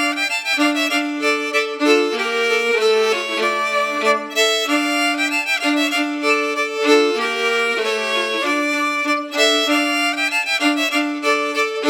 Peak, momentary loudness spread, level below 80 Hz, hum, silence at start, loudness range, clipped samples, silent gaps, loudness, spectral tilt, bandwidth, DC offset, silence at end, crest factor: -2 dBFS; 3 LU; -88 dBFS; none; 0 s; 1 LU; under 0.1%; none; -17 LUFS; -0.5 dB/octave; 19 kHz; under 0.1%; 0 s; 16 dB